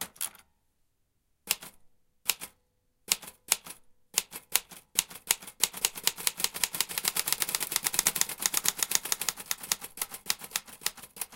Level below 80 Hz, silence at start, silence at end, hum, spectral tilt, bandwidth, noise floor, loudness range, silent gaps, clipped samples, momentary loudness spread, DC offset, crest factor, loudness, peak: -64 dBFS; 0 s; 0 s; none; 1.5 dB/octave; 17 kHz; -74 dBFS; 6 LU; none; under 0.1%; 9 LU; under 0.1%; 32 dB; -30 LUFS; -2 dBFS